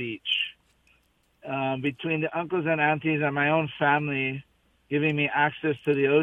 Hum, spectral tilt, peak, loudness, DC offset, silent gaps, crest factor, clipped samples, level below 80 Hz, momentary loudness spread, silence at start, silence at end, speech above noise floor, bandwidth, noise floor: none; -7.5 dB/octave; -8 dBFS; -26 LUFS; under 0.1%; none; 18 dB; under 0.1%; -66 dBFS; 7 LU; 0 s; 0 s; 41 dB; 3.9 kHz; -66 dBFS